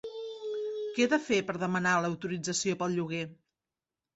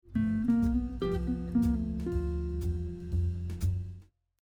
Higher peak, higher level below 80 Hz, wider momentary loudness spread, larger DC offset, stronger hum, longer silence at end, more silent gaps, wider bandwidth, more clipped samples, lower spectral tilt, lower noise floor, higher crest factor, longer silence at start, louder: first, -14 dBFS vs -18 dBFS; second, -72 dBFS vs -38 dBFS; first, 10 LU vs 7 LU; neither; neither; first, 0.8 s vs 0.4 s; neither; second, 8.2 kHz vs 15.5 kHz; neither; second, -4.5 dB/octave vs -9 dB/octave; first, under -90 dBFS vs -51 dBFS; about the same, 18 dB vs 14 dB; about the same, 0.05 s vs 0.05 s; about the same, -31 LUFS vs -32 LUFS